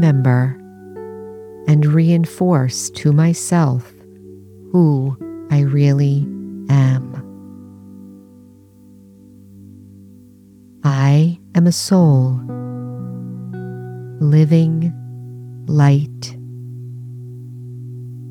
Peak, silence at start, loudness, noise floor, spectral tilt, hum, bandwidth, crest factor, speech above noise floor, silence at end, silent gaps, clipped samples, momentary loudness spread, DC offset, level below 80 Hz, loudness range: -2 dBFS; 0 s; -16 LUFS; -45 dBFS; -7 dB/octave; none; 13.5 kHz; 14 dB; 31 dB; 0 s; none; under 0.1%; 20 LU; under 0.1%; -60 dBFS; 5 LU